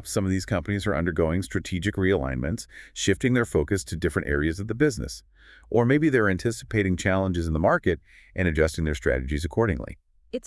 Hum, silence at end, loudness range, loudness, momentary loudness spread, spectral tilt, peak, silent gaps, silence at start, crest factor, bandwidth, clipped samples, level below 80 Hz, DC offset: none; 0.1 s; 2 LU; -25 LUFS; 10 LU; -6 dB/octave; -8 dBFS; none; 0 s; 18 dB; 12 kHz; under 0.1%; -40 dBFS; under 0.1%